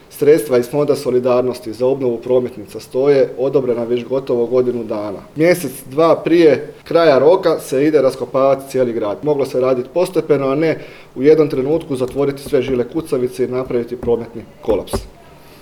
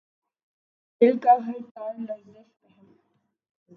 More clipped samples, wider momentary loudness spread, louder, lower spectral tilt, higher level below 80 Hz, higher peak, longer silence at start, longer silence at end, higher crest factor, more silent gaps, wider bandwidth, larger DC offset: neither; second, 9 LU vs 17 LU; first, -16 LUFS vs -23 LUFS; second, -6.5 dB/octave vs -8.5 dB/octave; first, -44 dBFS vs -84 dBFS; first, 0 dBFS vs -6 dBFS; second, 0.1 s vs 1 s; second, 0.5 s vs 1.6 s; second, 16 dB vs 22 dB; second, none vs 1.71-1.75 s; first, 18 kHz vs 5.8 kHz; neither